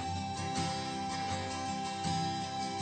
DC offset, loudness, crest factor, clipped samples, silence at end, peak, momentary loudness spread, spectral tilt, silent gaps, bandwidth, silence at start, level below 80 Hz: under 0.1%; -36 LUFS; 14 dB; under 0.1%; 0 s; -22 dBFS; 3 LU; -4 dB/octave; none; 9.2 kHz; 0 s; -62 dBFS